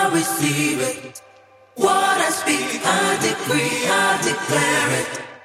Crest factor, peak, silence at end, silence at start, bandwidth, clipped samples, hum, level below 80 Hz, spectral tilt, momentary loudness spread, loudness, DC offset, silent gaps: 16 dB; -4 dBFS; 0.05 s; 0 s; 16 kHz; under 0.1%; none; -62 dBFS; -3 dB/octave; 6 LU; -19 LUFS; under 0.1%; none